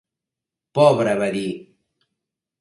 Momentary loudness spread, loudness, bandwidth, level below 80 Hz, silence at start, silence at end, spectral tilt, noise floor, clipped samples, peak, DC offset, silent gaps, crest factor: 14 LU; -19 LUFS; 11.5 kHz; -64 dBFS; 0.75 s; 1 s; -6 dB/octave; -87 dBFS; under 0.1%; -2 dBFS; under 0.1%; none; 22 dB